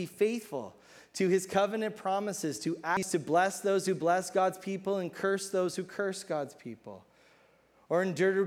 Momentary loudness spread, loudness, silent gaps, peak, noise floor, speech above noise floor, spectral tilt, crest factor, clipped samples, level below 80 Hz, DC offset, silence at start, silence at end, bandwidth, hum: 13 LU; -31 LUFS; none; -14 dBFS; -64 dBFS; 33 dB; -4.5 dB/octave; 18 dB; under 0.1%; -76 dBFS; under 0.1%; 0 s; 0 s; 16 kHz; none